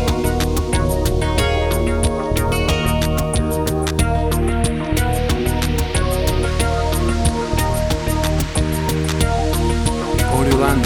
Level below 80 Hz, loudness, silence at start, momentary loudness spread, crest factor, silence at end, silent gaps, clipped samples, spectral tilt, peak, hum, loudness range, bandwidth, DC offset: -22 dBFS; -18 LUFS; 0 s; 2 LU; 14 dB; 0 s; none; under 0.1%; -5 dB/octave; -2 dBFS; none; 1 LU; 19.5 kHz; under 0.1%